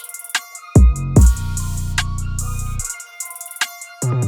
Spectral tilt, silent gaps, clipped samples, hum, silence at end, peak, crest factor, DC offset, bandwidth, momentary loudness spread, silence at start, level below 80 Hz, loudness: -5 dB/octave; none; under 0.1%; none; 0 s; 0 dBFS; 18 dB; under 0.1%; 19 kHz; 13 LU; 0 s; -20 dBFS; -19 LUFS